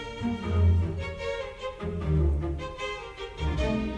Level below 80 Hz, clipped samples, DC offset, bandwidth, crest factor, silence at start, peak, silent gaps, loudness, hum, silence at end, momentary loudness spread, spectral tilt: -34 dBFS; under 0.1%; under 0.1%; 8.4 kHz; 14 dB; 0 s; -14 dBFS; none; -30 LUFS; none; 0 s; 11 LU; -7.5 dB/octave